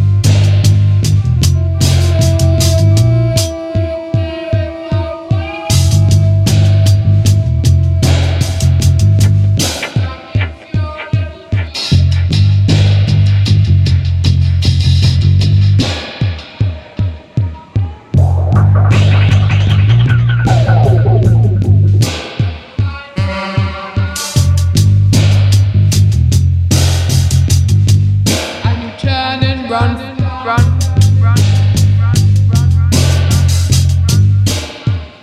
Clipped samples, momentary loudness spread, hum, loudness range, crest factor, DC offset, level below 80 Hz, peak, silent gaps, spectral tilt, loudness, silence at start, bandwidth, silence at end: under 0.1%; 9 LU; none; 4 LU; 10 dB; under 0.1%; -24 dBFS; 0 dBFS; none; -5.5 dB/octave; -12 LUFS; 0 s; 14.5 kHz; 0.1 s